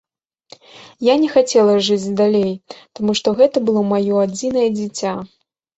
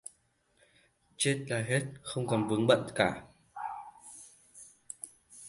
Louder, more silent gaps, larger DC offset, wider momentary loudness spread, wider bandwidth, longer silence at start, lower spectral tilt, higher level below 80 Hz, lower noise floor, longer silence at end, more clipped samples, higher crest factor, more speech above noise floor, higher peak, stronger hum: first, -16 LUFS vs -31 LUFS; neither; neither; second, 10 LU vs 24 LU; second, 8.2 kHz vs 11.5 kHz; second, 0.75 s vs 1.2 s; about the same, -5 dB/octave vs -4.5 dB/octave; first, -60 dBFS vs -66 dBFS; second, -47 dBFS vs -71 dBFS; first, 0.5 s vs 0 s; neither; second, 16 dB vs 24 dB; second, 31 dB vs 41 dB; first, -2 dBFS vs -10 dBFS; neither